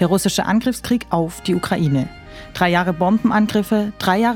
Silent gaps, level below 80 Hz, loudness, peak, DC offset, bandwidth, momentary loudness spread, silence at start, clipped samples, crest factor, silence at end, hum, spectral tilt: none; -44 dBFS; -18 LUFS; 0 dBFS; under 0.1%; 17.5 kHz; 5 LU; 0 s; under 0.1%; 18 dB; 0 s; none; -5.5 dB/octave